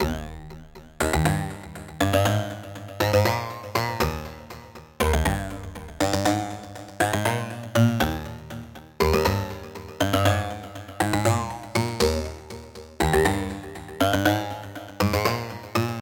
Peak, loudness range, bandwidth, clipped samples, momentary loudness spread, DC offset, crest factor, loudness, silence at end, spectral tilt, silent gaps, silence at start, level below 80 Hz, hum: -6 dBFS; 2 LU; 17 kHz; under 0.1%; 18 LU; under 0.1%; 20 dB; -25 LUFS; 0 s; -5 dB/octave; none; 0 s; -38 dBFS; none